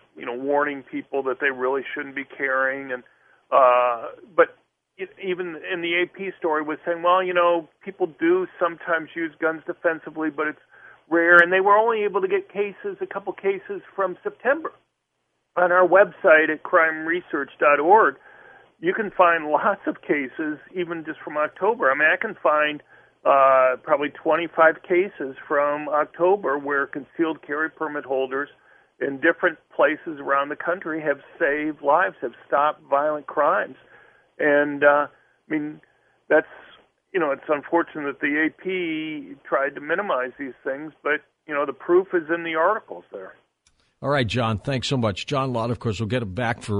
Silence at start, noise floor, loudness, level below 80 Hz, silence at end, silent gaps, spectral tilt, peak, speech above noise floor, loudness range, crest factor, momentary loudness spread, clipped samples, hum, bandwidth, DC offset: 0.15 s; -75 dBFS; -22 LUFS; -64 dBFS; 0 s; none; -6.5 dB/octave; 0 dBFS; 53 dB; 5 LU; 22 dB; 13 LU; under 0.1%; none; 10.5 kHz; under 0.1%